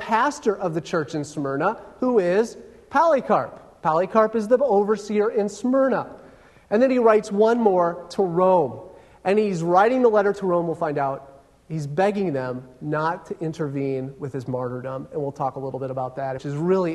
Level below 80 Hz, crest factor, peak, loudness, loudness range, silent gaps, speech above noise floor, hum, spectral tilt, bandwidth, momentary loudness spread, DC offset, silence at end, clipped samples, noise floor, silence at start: -60 dBFS; 18 dB; -4 dBFS; -22 LUFS; 8 LU; none; 28 dB; none; -7 dB/octave; 12 kHz; 11 LU; under 0.1%; 0 s; under 0.1%; -49 dBFS; 0 s